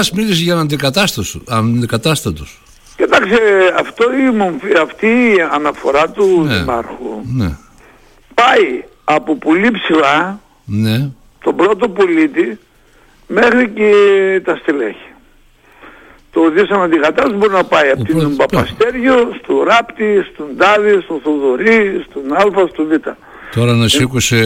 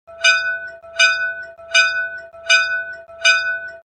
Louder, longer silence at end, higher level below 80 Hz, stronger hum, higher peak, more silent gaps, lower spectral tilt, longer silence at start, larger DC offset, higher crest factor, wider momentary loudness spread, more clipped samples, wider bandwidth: first, -13 LUFS vs -16 LUFS; about the same, 0 s vs 0.05 s; first, -40 dBFS vs -60 dBFS; neither; about the same, 0 dBFS vs 0 dBFS; neither; first, -5 dB/octave vs 3 dB/octave; about the same, 0 s vs 0.1 s; neither; second, 12 dB vs 18 dB; second, 10 LU vs 14 LU; neither; first, 16.5 kHz vs 9.8 kHz